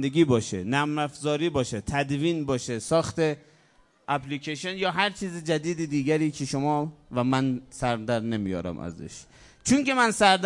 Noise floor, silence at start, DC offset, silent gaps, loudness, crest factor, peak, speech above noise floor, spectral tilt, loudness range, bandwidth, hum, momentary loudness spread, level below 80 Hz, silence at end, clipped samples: -61 dBFS; 0 s; under 0.1%; none; -26 LUFS; 20 dB; -6 dBFS; 35 dB; -5 dB/octave; 2 LU; 11.5 kHz; none; 10 LU; -56 dBFS; 0 s; under 0.1%